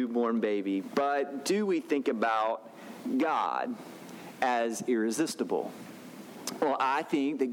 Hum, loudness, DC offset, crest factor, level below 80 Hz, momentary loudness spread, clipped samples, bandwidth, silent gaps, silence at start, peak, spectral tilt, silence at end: none; -30 LUFS; under 0.1%; 16 dB; -82 dBFS; 17 LU; under 0.1%; 20 kHz; none; 0 s; -14 dBFS; -4.5 dB/octave; 0 s